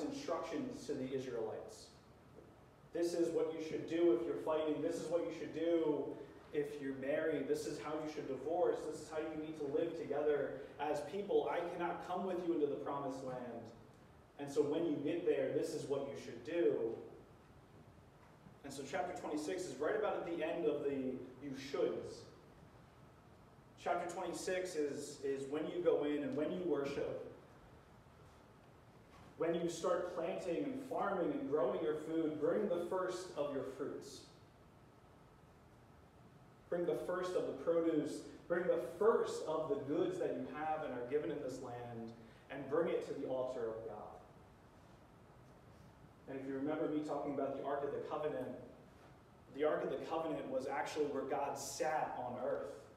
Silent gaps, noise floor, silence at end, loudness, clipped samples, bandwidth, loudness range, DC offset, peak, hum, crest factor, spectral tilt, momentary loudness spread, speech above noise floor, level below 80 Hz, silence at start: none; -63 dBFS; 0 s; -40 LUFS; under 0.1%; 14.5 kHz; 6 LU; under 0.1%; -20 dBFS; none; 20 dB; -5.5 dB/octave; 13 LU; 24 dB; -72 dBFS; 0 s